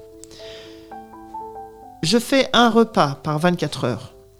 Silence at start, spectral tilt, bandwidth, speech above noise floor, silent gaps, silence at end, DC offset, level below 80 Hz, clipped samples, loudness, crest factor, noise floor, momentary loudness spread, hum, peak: 0 s; -5 dB/octave; 16 kHz; 22 dB; none; 0.3 s; under 0.1%; -52 dBFS; under 0.1%; -19 LUFS; 20 dB; -40 dBFS; 24 LU; none; -2 dBFS